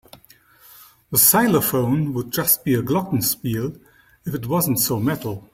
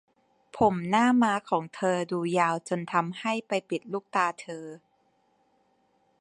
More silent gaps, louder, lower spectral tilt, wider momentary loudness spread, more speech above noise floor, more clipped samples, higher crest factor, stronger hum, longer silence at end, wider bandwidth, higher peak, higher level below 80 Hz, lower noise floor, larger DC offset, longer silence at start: neither; first, -19 LUFS vs -27 LUFS; about the same, -4.5 dB/octave vs -5.5 dB/octave; about the same, 14 LU vs 14 LU; second, 32 dB vs 42 dB; neither; about the same, 22 dB vs 20 dB; neither; second, 0.1 s vs 1.45 s; first, 16.5 kHz vs 10.5 kHz; first, 0 dBFS vs -8 dBFS; first, -54 dBFS vs -64 dBFS; second, -52 dBFS vs -69 dBFS; neither; first, 1.1 s vs 0.55 s